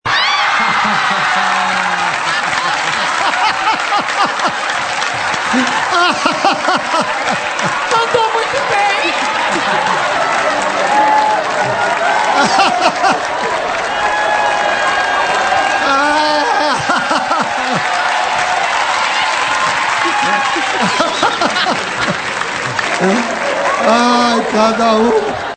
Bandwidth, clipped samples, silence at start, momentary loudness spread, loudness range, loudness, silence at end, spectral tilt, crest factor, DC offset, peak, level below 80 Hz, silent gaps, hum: 9.2 kHz; under 0.1%; 0.05 s; 4 LU; 1 LU; -13 LUFS; 0 s; -2.5 dB/octave; 14 dB; under 0.1%; 0 dBFS; -50 dBFS; none; none